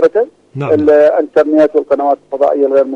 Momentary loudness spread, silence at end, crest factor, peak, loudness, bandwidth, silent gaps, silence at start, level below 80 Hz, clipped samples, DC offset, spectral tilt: 8 LU; 0 s; 10 dB; 0 dBFS; -11 LUFS; 7.4 kHz; none; 0 s; -54 dBFS; under 0.1%; under 0.1%; -8 dB/octave